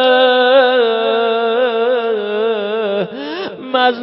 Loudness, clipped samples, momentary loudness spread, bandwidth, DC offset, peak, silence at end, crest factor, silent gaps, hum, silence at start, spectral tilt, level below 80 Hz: -14 LUFS; under 0.1%; 11 LU; 5.8 kHz; under 0.1%; 0 dBFS; 0 s; 14 dB; none; none; 0 s; -8.5 dB/octave; -72 dBFS